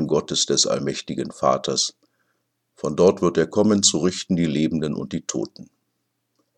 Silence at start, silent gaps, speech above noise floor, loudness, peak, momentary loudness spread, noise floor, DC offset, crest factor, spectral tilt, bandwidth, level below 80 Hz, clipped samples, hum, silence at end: 0 s; none; 53 dB; -21 LUFS; -4 dBFS; 11 LU; -74 dBFS; under 0.1%; 20 dB; -4 dB/octave; 11 kHz; -56 dBFS; under 0.1%; none; 0.95 s